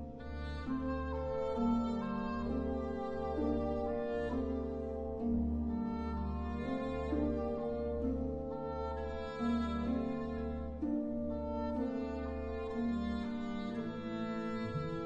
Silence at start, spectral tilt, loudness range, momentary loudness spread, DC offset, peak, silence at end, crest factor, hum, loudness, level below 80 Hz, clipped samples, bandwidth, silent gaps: 0 s; -8.5 dB/octave; 2 LU; 5 LU; under 0.1%; -22 dBFS; 0 s; 14 dB; none; -38 LUFS; -46 dBFS; under 0.1%; 7.6 kHz; none